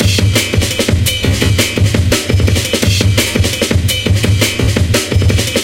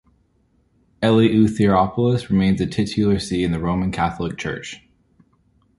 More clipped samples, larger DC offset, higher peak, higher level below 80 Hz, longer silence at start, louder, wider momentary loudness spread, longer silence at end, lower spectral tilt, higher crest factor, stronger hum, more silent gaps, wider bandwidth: neither; neither; first, 0 dBFS vs -4 dBFS; first, -22 dBFS vs -42 dBFS; second, 0 s vs 1 s; first, -12 LUFS vs -19 LUFS; second, 2 LU vs 11 LU; second, 0 s vs 1 s; second, -4 dB/octave vs -7 dB/octave; second, 12 dB vs 18 dB; neither; neither; first, 17 kHz vs 11.5 kHz